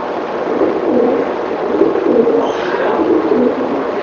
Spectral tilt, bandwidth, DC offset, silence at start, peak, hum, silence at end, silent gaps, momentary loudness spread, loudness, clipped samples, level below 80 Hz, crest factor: -6.5 dB/octave; 7 kHz; under 0.1%; 0 s; 0 dBFS; none; 0 s; none; 6 LU; -14 LUFS; under 0.1%; -50 dBFS; 14 dB